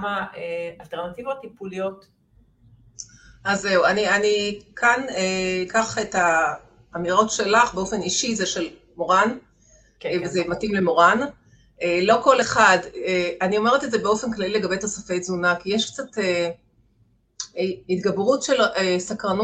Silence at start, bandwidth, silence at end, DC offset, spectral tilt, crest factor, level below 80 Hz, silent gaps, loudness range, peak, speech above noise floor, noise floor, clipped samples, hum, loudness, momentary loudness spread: 0 s; 9.2 kHz; 0 s; under 0.1%; -3.5 dB/octave; 20 dB; -56 dBFS; none; 6 LU; -2 dBFS; 40 dB; -62 dBFS; under 0.1%; none; -21 LUFS; 14 LU